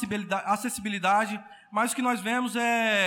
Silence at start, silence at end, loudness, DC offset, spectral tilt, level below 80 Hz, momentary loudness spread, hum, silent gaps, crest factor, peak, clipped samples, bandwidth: 0 s; 0 s; -27 LUFS; under 0.1%; -3 dB/octave; -68 dBFS; 7 LU; none; none; 14 dB; -12 dBFS; under 0.1%; 18 kHz